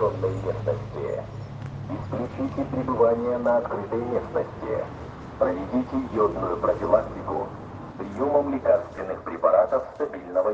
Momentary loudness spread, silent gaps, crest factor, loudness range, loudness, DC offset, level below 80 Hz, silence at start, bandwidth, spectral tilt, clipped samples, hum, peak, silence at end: 14 LU; none; 20 dB; 2 LU; -26 LUFS; under 0.1%; -48 dBFS; 0 s; 7.6 kHz; -9 dB/octave; under 0.1%; none; -6 dBFS; 0 s